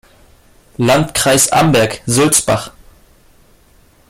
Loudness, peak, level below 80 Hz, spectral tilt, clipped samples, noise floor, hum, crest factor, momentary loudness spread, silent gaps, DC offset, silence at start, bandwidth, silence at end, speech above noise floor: -12 LUFS; 0 dBFS; -42 dBFS; -3.5 dB/octave; under 0.1%; -49 dBFS; none; 16 dB; 8 LU; none; under 0.1%; 0.8 s; 16.5 kHz; 1.4 s; 36 dB